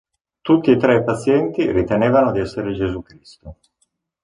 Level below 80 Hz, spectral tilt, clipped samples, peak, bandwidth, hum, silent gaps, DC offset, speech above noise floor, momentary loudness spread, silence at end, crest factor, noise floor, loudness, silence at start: -44 dBFS; -7.5 dB/octave; under 0.1%; -2 dBFS; 10.5 kHz; none; none; under 0.1%; 51 dB; 10 LU; 0.7 s; 16 dB; -68 dBFS; -17 LUFS; 0.45 s